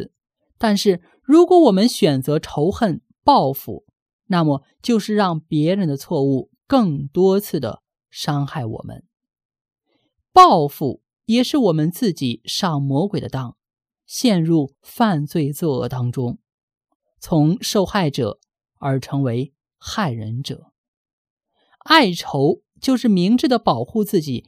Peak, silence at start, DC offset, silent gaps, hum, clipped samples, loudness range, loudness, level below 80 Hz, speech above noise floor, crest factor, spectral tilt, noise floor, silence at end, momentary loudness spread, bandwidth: 0 dBFS; 0 s; under 0.1%; 4.02-4.06 s, 4.13-4.19 s, 9.45-9.50 s, 9.61-9.65 s, 16.54-16.68 s, 16.95-17.00 s, 20.78-21.05 s, 21.13-21.37 s; none; under 0.1%; 6 LU; -18 LUFS; -52 dBFS; 51 dB; 18 dB; -6 dB/octave; -69 dBFS; 0.05 s; 15 LU; 16 kHz